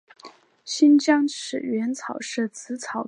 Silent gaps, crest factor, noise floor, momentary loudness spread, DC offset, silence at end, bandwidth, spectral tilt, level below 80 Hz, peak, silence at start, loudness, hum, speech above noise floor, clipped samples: none; 18 dB; -49 dBFS; 14 LU; under 0.1%; 0 s; 10 kHz; -3.5 dB/octave; -82 dBFS; -6 dBFS; 0.25 s; -23 LUFS; none; 26 dB; under 0.1%